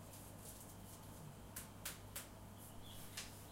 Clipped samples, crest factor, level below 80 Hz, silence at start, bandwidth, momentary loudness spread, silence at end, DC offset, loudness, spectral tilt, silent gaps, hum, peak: under 0.1%; 22 dB; -64 dBFS; 0 s; 16 kHz; 6 LU; 0 s; under 0.1%; -53 LUFS; -3 dB/octave; none; none; -32 dBFS